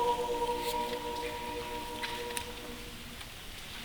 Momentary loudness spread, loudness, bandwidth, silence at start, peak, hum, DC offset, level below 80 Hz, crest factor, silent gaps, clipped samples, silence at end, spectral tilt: 11 LU; -37 LUFS; over 20 kHz; 0 s; -14 dBFS; none; under 0.1%; -52 dBFS; 22 dB; none; under 0.1%; 0 s; -3 dB/octave